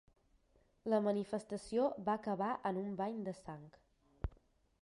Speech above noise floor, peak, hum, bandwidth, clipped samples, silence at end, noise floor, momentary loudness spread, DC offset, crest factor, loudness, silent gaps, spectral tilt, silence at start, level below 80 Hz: 35 dB; -22 dBFS; none; 11.5 kHz; under 0.1%; 0.55 s; -73 dBFS; 13 LU; under 0.1%; 18 dB; -39 LUFS; none; -7 dB/octave; 0.85 s; -58 dBFS